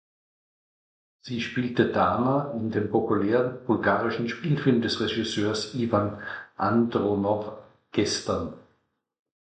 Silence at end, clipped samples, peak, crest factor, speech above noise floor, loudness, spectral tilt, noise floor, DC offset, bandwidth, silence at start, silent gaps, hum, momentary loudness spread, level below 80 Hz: 0.9 s; under 0.1%; -6 dBFS; 20 dB; 46 dB; -26 LUFS; -5.5 dB/octave; -72 dBFS; under 0.1%; 9.2 kHz; 1.25 s; none; none; 8 LU; -56 dBFS